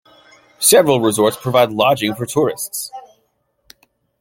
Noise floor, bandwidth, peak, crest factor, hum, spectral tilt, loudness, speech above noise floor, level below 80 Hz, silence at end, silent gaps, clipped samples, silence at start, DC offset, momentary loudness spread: -65 dBFS; 17 kHz; 0 dBFS; 18 dB; none; -3.5 dB/octave; -15 LUFS; 50 dB; -58 dBFS; 1.2 s; none; under 0.1%; 0.6 s; under 0.1%; 13 LU